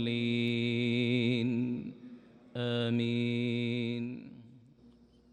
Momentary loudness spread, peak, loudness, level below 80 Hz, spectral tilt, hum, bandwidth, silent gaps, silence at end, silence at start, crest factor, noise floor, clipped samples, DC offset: 16 LU; -18 dBFS; -32 LUFS; -74 dBFS; -7.5 dB/octave; none; 8.8 kHz; none; 0.75 s; 0 s; 16 dB; -60 dBFS; under 0.1%; under 0.1%